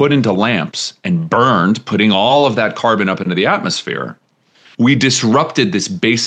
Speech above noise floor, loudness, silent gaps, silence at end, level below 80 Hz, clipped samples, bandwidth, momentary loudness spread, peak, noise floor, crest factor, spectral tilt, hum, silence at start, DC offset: 35 dB; -14 LUFS; none; 0 s; -62 dBFS; under 0.1%; 9.6 kHz; 8 LU; 0 dBFS; -49 dBFS; 14 dB; -4.5 dB/octave; none; 0 s; under 0.1%